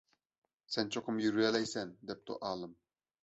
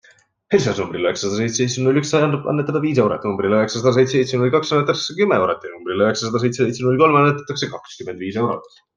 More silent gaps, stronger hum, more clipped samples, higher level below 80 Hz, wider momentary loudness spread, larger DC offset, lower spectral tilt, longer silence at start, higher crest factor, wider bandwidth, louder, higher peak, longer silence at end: neither; neither; neither; second, -76 dBFS vs -58 dBFS; first, 13 LU vs 9 LU; neither; second, -3 dB/octave vs -5.5 dB/octave; first, 0.7 s vs 0.5 s; about the same, 22 dB vs 18 dB; second, 8 kHz vs 9.8 kHz; second, -36 LUFS vs -18 LUFS; second, -16 dBFS vs 0 dBFS; first, 0.5 s vs 0.3 s